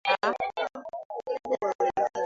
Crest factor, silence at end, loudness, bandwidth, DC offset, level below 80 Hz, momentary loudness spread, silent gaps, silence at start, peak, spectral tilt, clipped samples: 18 dB; 0 s; -30 LUFS; 7.6 kHz; under 0.1%; -68 dBFS; 11 LU; 1.05-1.10 s, 1.75-1.79 s; 0.05 s; -12 dBFS; -3 dB/octave; under 0.1%